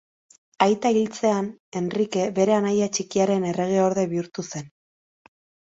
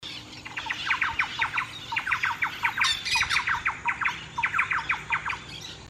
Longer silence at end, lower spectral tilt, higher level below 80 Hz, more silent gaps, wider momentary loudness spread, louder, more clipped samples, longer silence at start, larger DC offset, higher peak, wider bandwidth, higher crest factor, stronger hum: first, 1 s vs 0 s; first, -5.5 dB/octave vs -1 dB/octave; second, -66 dBFS vs -54 dBFS; first, 1.60-1.72 s vs none; about the same, 10 LU vs 10 LU; first, -23 LUFS vs -26 LUFS; neither; first, 0.6 s vs 0 s; neither; first, -2 dBFS vs -10 dBFS; second, 8 kHz vs 15.5 kHz; about the same, 22 dB vs 18 dB; neither